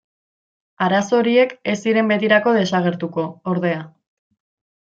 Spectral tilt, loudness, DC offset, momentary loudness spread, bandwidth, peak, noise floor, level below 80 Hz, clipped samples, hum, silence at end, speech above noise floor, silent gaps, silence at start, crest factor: -6 dB/octave; -18 LUFS; under 0.1%; 9 LU; 7.8 kHz; -2 dBFS; under -90 dBFS; -66 dBFS; under 0.1%; none; 0.95 s; over 72 dB; none; 0.8 s; 18 dB